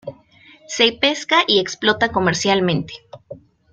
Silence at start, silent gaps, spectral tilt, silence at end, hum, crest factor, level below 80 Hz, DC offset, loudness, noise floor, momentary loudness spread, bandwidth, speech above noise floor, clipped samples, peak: 0.05 s; none; -3.5 dB/octave; 0.35 s; none; 18 dB; -54 dBFS; under 0.1%; -17 LUFS; -49 dBFS; 16 LU; 9.2 kHz; 31 dB; under 0.1%; -2 dBFS